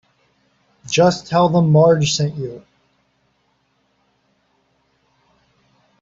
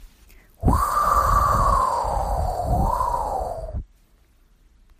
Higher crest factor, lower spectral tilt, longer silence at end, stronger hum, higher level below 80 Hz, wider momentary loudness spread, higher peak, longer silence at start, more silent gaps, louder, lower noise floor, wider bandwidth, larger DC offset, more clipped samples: about the same, 18 dB vs 16 dB; about the same, -5.5 dB/octave vs -6 dB/octave; first, 3.45 s vs 1.15 s; neither; second, -56 dBFS vs -28 dBFS; first, 17 LU vs 11 LU; first, -2 dBFS vs -8 dBFS; first, 0.85 s vs 0 s; neither; first, -16 LUFS vs -22 LUFS; first, -64 dBFS vs -57 dBFS; second, 7.8 kHz vs 15.5 kHz; neither; neither